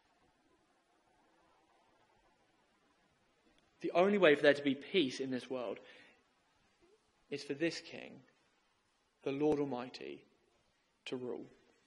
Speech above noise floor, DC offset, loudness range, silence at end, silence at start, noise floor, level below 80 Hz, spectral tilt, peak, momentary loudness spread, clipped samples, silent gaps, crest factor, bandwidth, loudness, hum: 42 dB; under 0.1%; 12 LU; 0.4 s; 3.8 s; -77 dBFS; -78 dBFS; -5 dB/octave; -12 dBFS; 22 LU; under 0.1%; none; 26 dB; 11 kHz; -35 LUFS; none